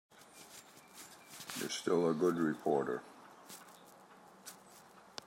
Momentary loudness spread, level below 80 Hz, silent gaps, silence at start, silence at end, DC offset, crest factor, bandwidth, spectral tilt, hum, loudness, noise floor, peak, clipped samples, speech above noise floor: 25 LU; -82 dBFS; none; 0.35 s; 0.25 s; under 0.1%; 20 dB; 16 kHz; -4.5 dB/octave; none; -35 LUFS; -59 dBFS; -18 dBFS; under 0.1%; 26 dB